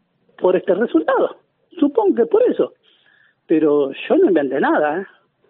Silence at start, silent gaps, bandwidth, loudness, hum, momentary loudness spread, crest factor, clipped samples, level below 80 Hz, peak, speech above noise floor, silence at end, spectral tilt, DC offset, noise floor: 0.4 s; none; 4 kHz; -17 LUFS; none; 7 LU; 16 dB; under 0.1%; -72 dBFS; -2 dBFS; 40 dB; 0.45 s; -4.5 dB/octave; under 0.1%; -56 dBFS